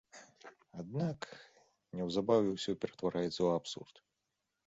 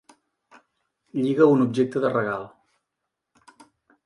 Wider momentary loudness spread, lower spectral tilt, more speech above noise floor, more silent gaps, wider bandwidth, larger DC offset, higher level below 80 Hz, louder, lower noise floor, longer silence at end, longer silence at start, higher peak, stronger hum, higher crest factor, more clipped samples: first, 24 LU vs 15 LU; second, -5.5 dB/octave vs -8 dB/octave; second, 51 dB vs 61 dB; neither; second, 8 kHz vs 11 kHz; neither; about the same, -70 dBFS vs -70 dBFS; second, -36 LUFS vs -22 LUFS; first, -86 dBFS vs -82 dBFS; second, 0.8 s vs 1.6 s; second, 0.15 s vs 1.15 s; second, -16 dBFS vs -4 dBFS; neither; about the same, 20 dB vs 22 dB; neither